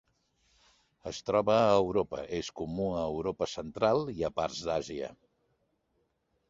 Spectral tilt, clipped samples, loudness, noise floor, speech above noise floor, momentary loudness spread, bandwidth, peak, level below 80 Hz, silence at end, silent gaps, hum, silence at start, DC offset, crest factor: -5.5 dB/octave; under 0.1%; -31 LUFS; -77 dBFS; 46 dB; 14 LU; 8 kHz; -12 dBFS; -58 dBFS; 1.35 s; none; none; 1.05 s; under 0.1%; 22 dB